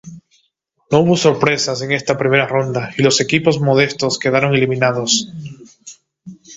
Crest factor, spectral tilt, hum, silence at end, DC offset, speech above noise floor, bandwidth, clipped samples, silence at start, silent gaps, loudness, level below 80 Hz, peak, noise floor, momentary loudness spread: 16 dB; -4.5 dB/octave; none; 0 s; under 0.1%; 49 dB; 8 kHz; under 0.1%; 0.05 s; none; -15 LUFS; -54 dBFS; 0 dBFS; -65 dBFS; 5 LU